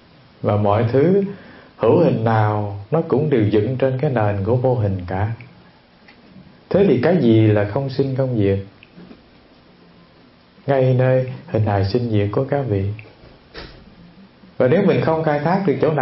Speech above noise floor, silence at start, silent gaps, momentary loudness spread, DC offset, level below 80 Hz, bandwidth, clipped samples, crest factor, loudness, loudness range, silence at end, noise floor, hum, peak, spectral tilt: 33 dB; 0.4 s; none; 11 LU; under 0.1%; -52 dBFS; 5.8 kHz; under 0.1%; 16 dB; -18 LUFS; 5 LU; 0 s; -50 dBFS; none; -2 dBFS; -12.5 dB/octave